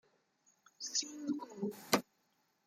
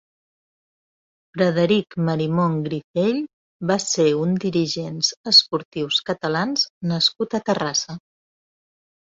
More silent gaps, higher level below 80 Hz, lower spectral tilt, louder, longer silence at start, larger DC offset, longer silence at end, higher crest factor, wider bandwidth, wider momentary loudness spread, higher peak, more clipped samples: second, none vs 2.84-2.94 s, 3.33-3.60 s, 5.17-5.24 s, 5.65-5.71 s, 6.70-6.81 s; second, -82 dBFS vs -62 dBFS; second, -2.5 dB/octave vs -4 dB/octave; second, -38 LUFS vs -20 LUFS; second, 0.8 s vs 1.35 s; neither; second, 0.65 s vs 1.1 s; first, 28 dB vs 20 dB; first, 16 kHz vs 8 kHz; second, 8 LU vs 11 LU; second, -14 dBFS vs -2 dBFS; neither